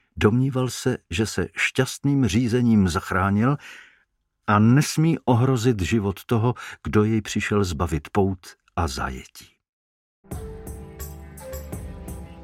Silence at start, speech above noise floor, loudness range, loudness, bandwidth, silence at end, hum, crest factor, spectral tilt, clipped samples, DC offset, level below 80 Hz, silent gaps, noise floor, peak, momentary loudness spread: 0.15 s; 47 dB; 12 LU; -22 LUFS; 16 kHz; 0 s; none; 20 dB; -6 dB/octave; under 0.1%; under 0.1%; -42 dBFS; 9.69-10.24 s; -68 dBFS; -2 dBFS; 18 LU